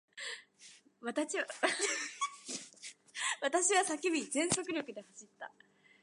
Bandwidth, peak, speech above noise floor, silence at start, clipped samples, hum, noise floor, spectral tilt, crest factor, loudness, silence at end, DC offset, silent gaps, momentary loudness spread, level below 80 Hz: 11.5 kHz; -14 dBFS; 25 dB; 0.15 s; under 0.1%; none; -60 dBFS; -1.5 dB/octave; 22 dB; -35 LUFS; 0.55 s; under 0.1%; none; 20 LU; -80 dBFS